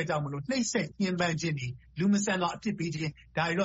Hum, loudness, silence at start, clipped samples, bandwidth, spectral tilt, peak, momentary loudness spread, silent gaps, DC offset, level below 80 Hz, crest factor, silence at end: none; -31 LUFS; 0 s; under 0.1%; 8 kHz; -5 dB/octave; -14 dBFS; 7 LU; none; under 0.1%; -60 dBFS; 16 dB; 0 s